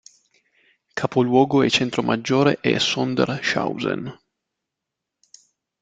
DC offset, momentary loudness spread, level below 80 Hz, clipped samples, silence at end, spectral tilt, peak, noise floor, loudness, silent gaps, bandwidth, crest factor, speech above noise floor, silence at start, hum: under 0.1%; 10 LU; -60 dBFS; under 0.1%; 1.7 s; -5 dB/octave; -2 dBFS; -83 dBFS; -20 LUFS; none; 9.2 kHz; 20 dB; 63 dB; 0.95 s; none